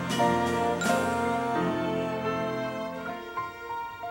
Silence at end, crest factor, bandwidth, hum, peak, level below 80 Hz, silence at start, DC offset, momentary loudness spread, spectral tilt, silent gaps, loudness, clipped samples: 0 s; 18 dB; 16 kHz; none; -12 dBFS; -62 dBFS; 0 s; under 0.1%; 10 LU; -5 dB/octave; none; -29 LUFS; under 0.1%